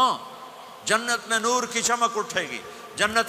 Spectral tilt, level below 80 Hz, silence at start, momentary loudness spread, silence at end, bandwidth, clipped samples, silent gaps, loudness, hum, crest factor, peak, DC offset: -1 dB/octave; -64 dBFS; 0 s; 15 LU; 0 s; 15.5 kHz; under 0.1%; none; -24 LUFS; none; 20 dB; -4 dBFS; under 0.1%